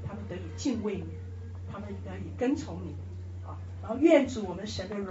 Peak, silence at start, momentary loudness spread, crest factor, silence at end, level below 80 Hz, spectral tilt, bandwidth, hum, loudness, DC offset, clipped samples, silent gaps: -10 dBFS; 0 s; 18 LU; 22 dB; 0 s; -54 dBFS; -6.5 dB/octave; 8 kHz; none; -32 LUFS; under 0.1%; under 0.1%; none